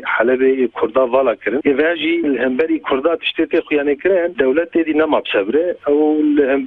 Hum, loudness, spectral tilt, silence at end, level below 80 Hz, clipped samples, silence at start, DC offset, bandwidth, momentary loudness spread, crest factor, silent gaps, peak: none; -16 LUFS; -7.5 dB/octave; 0 s; -54 dBFS; under 0.1%; 0 s; under 0.1%; 4.2 kHz; 3 LU; 14 dB; none; -2 dBFS